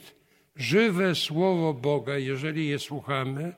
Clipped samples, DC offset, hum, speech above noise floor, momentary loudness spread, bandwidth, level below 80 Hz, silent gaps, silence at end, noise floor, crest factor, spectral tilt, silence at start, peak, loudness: under 0.1%; under 0.1%; none; 32 dB; 7 LU; 16 kHz; -70 dBFS; none; 0.05 s; -58 dBFS; 16 dB; -5.5 dB/octave; 0.05 s; -10 dBFS; -26 LUFS